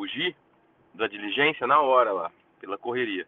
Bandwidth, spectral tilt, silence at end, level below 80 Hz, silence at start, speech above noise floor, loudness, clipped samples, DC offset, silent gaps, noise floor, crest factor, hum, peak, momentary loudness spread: 4.3 kHz; -6.5 dB/octave; 0.05 s; -72 dBFS; 0 s; 37 dB; -25 LUFS; under 0.1%; under 0.1%; none; -62 dBFS; 18 dB; none; -8 dBFS; 14 LU